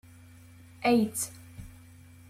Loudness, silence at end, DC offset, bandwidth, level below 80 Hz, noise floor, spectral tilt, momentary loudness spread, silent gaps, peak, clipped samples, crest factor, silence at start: -28 LUFS; 0.6 s; under 0.1%; 16 kHz; -60 dBFS; -52 dBFS; -4.5 dB/octave; 23 LU; none; -14 dBFS; under 0.1%; 18 dB; 0.8 s